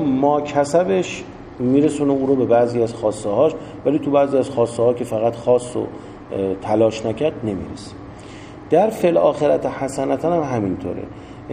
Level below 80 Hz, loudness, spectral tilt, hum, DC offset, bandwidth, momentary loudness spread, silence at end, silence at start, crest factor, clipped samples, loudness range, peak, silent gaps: -48 dBFS; -19 LUFS; -6.5 dB/octave; none; under 0.1%; 14 kHz; 16 LU; 0 s; 0 s; 16 dB; under 0.1%; 3 LU; -2 dBFS; none